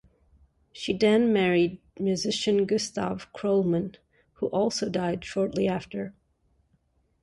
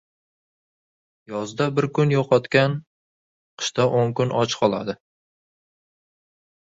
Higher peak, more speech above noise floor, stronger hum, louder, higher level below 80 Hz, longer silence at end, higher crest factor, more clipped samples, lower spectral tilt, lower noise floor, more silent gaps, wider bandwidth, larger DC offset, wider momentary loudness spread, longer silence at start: second, -12 dBFS vs -4 dBFS; second, 43 dB vs over 69 dB; neither; second, -26 LUFS vs -22 LUFS; about the same, -60 dBFS vs -62 dBFS; second, 1.1 s vs 1.7 s; about the same, 16 dB vs 20 dB; neither; about the same, -5.5 dB/octave vs -5.5 dB/octave; second, -69 dBFS vs under -90 dBFS; second, none vs 2.87-3.57 s; first, 11.5 kHz vs 7.8 kHz; neither; about the same, 11 LU vs 13 LU; second, 0.75 s vs 1.3 s